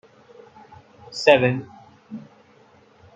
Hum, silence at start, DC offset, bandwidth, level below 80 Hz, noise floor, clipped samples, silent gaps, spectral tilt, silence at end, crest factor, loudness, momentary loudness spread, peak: none; 1.1 s; under 0.1%; 9 kHz; -66 dBFS; -54 dBFS; under 0.1%; none; -5.5 dB/octave; 0.95 s; 24 dB; -19 LUFS; 24 LU; -2 dBFS